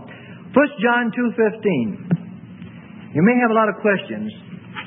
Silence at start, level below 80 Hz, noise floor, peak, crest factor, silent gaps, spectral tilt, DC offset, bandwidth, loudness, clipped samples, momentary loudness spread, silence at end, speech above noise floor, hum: 0 s; -64 dBFS; -38 dBFS; -2 dBFS; 18 dB; none; -12 dB/octave; under 0.1%; 3.8 kHz; -19 LUFS; under 0.1%; 22 LU; 0 s; 20 dB; none